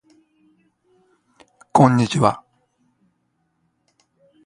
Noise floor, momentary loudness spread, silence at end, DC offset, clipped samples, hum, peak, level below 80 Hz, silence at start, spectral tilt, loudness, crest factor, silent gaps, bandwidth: -69 dBFS; 8 LU; 2.1 s; under 0.1%; under 0.1%; none; 0 dBFS; -58 dBFS; 1.75 s; -6.5 dB/octave; -17 LUFS; 24 dB; none; 11 kHz